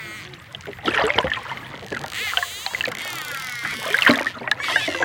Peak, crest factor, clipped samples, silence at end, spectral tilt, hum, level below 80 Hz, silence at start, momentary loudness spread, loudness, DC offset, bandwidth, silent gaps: 0 dBFS; 24 dB; under 0.1%; 0 s; -2.5 dB/octave; none; -52 dBFS; 0 s; 17 LU; -22 LUFS; under 0.1%; 17.5 kHz; none